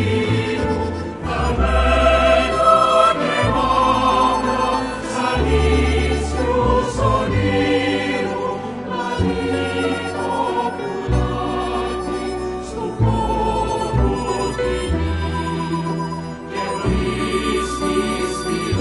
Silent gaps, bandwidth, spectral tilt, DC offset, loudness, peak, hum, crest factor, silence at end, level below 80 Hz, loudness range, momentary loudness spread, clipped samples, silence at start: none; 11.5 kHz; -6 dB/octave; under 0.1%; -19 LUFS; -2 dBFS; none; 16 dB; 0 s; -28 dBFS; 6 LU; 10 LU; under 0.1%; 0 s